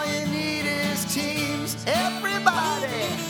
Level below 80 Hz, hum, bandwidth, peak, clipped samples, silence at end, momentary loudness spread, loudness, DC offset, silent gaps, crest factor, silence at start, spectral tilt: -58 dBFS; none; over 20 kHz; -4 dBFS; under 0.1%; 0 s; 4 LU; -24 LUFS; under 0.1%; none; 22 dB; 0 s; -3.5 dB/octave